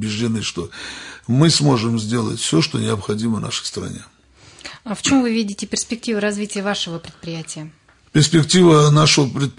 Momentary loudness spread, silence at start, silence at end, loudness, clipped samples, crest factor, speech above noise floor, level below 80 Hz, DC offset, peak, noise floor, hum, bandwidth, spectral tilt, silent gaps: 19 LU; 0 s; 0.05 s; -17 LUFS; under 0.1%; 16 dB; 29 dB; -52 dBFS; under 0.1%; -2 dBFS; -47 dBFS; none; 11 kHz; -4.5 dB/octave; none